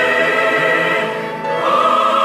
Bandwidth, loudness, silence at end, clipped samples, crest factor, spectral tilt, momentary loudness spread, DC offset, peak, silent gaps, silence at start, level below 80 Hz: 16 kHz; -15 LUFS; 0 s; under 0.1%; 12 dB; -4 dB/octave; 8 LU; under 0.1%; -4 dBFS; none; 0 s; -62 dBFS